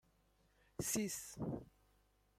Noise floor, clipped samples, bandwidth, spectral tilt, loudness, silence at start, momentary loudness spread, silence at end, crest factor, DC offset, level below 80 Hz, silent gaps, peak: -75 dBFS; under 0.1%; 16 kHz; -4 dB/octave; -43 LUFS; 0.8 s; 11 LU; 0.7 s; 20 dB; under 0.1%; -68 dBFS; none; -26 dBFS